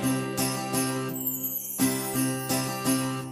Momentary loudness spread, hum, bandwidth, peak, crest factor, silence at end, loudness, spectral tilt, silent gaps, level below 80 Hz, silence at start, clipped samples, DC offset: 3 LU; none; 15.5 kHz; -12 dBFS; 16 dB; 0 s; -27 LUFS; -4 dB/octave; none; -60 dBFS; 0 s; under 0.1%; under 0.1%